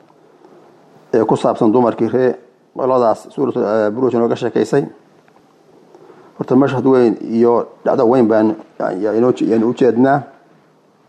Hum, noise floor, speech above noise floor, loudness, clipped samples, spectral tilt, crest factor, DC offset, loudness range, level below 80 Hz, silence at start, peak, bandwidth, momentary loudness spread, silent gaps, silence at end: none; -52 dBFS; 38 dB; -15 LUFS; under 0.1%; -8 dB/octave; 14 dB; under 0.1%; 4 LU; -62 dBFS; 1.15 s; -2 dBFS; 9.8 kHz; 7 LU; none; 0.85 s